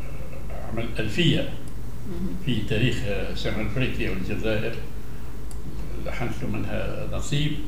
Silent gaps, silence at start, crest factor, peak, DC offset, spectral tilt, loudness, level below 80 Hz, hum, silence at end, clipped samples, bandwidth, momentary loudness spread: none; 0 s; 20 dB; -8 dBFS; 6%; -6 dB/octave; -28 LUFS; -36 dBFS; none; 0 s; under 0.1%; 16 kHz; 14 LU